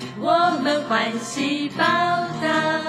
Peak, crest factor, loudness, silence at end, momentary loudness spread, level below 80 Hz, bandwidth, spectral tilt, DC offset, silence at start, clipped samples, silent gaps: -6 dBFS; 14 dB; -21 LUFS; 0 s; 5 LU; -66 dBFS; 14.5 kHz; -4 dB/octave; under 0.1%; 0 s; under 0.1%; none